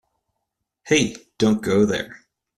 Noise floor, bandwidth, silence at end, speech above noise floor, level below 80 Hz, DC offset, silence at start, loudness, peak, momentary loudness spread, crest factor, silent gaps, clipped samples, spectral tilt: -79 dBFS; 13.5 kHz; 0.45 s; 60 dB; -54 dBFS; under 0.1%; 0.85 s; -21 LUFS; -4 dBFS; 8 LU; 20 dB; none; under 0.1%; -4.5 dB/octave